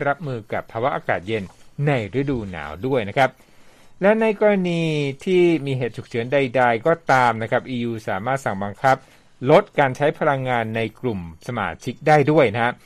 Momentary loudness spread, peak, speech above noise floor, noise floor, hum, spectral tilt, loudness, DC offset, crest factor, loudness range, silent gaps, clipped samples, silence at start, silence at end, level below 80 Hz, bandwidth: 11 LU; -2 dBFS; 26 dB; -46 dBFS; none; -7 dB/octave; -21 LUFS; under 0.1%; 18 dB; 4 LU; none; under 0.1%; 0 s; 0.1 s; -52 dBFS; 14 kHz